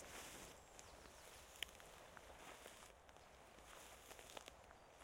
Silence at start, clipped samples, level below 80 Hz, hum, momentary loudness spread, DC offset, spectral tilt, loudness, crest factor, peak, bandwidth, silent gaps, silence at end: 0 s; under 0.1%; -72 dBFS; none; 11 LU; under 0.1%; -1.5 dB/octave; -58 LUFS; 36 dB; -24 dBFS; 16.5 kHz; none; 0 s